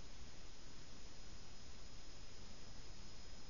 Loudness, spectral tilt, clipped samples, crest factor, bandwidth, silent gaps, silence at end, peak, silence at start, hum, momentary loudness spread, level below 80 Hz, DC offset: -58 LUFS; -3.5 dB/octave; under 0.1%; 12 dB; 7.2 kHz; none; 0 s; -38 dBFS; 0 s; none; 1 LU; -60 dBFS; 0.5%